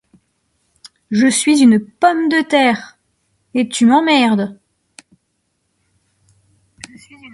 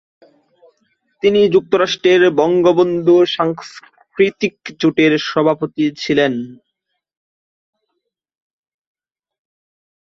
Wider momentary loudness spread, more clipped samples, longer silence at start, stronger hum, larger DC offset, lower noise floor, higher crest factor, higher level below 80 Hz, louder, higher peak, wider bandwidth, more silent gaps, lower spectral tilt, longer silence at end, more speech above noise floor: first, 13 LU vs 10 LU; neither; second, 1.1 s vs 1.25 s; neither; neither; second, -68 dBFS vs -75 dBFS; about the same, 16 dB vs 16 dB; about the same, -62 dBFS vs -58 dBFS; about the same, -14 LUFS vs -15 LUFS; about the same, 0 dBFS vs 0 dBFS; first, 11.5 kHz vs 7.2 kHz; neither; second, -4 dB/octave vs -5.5 dB/octave; second, 0.05 s vs 3.55 s; second, 55 dB vs 60 dB